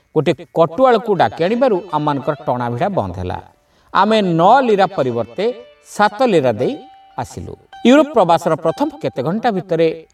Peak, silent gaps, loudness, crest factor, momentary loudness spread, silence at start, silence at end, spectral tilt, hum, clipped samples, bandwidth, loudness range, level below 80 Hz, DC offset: 0 dBFS; none; -16 LUFS; 16 dB; 16 LU; 0.15 s; 0.1 s; -6.5 dB/octave; none; under 0.1%; 13.5 kHz; 3 LU; -52 dBFS; under 0.1%